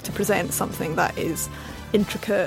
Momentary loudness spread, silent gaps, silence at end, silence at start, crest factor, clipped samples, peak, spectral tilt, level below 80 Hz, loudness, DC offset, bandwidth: 6 LU; none; 0 s; 0 s; 18 dB; under 0.1%; -6 dBFS; -4.5 dB/octave; -44 dBFS; -25 LUFS; under 0.1%; 17 kHz